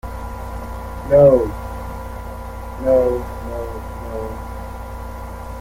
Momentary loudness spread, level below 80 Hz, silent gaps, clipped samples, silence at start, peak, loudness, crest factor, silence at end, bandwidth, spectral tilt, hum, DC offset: 19 LU; -32 dBFS; none; under 0.1%; 0.05 s; -2 dBFS; -20 LUFS; 18 dB; 0 s; 16.5 kHz; -8 dB/octave; none; under 0.1%